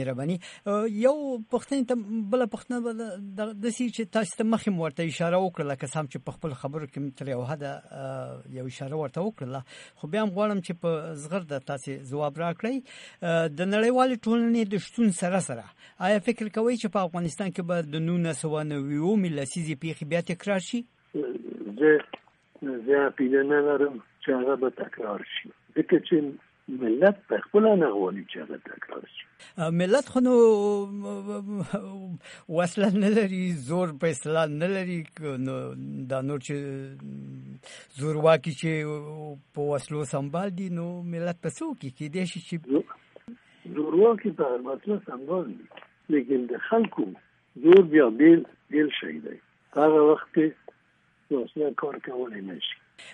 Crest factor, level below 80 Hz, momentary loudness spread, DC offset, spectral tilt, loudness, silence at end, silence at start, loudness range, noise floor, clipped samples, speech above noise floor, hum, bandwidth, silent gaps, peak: 20 dB; -70 dBFS; 16 LU; under 0.1%; -6.5 dB/octave; -26 LUFS; 0 s; 0 s; 9 LU; -65 dBFS; under 0.1%; 39 dB; none; 11 kHz; none; -6 dBFS